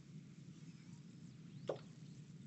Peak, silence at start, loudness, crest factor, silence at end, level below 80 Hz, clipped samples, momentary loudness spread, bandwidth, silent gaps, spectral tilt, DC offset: -28 dBFS; 0 s; -54 LUFS; 26 dB; 0 s; -84 dBFS; under 0.1%; 9 LU; 8.2 kHz; none; -6.5 dB/octave; under 0.1%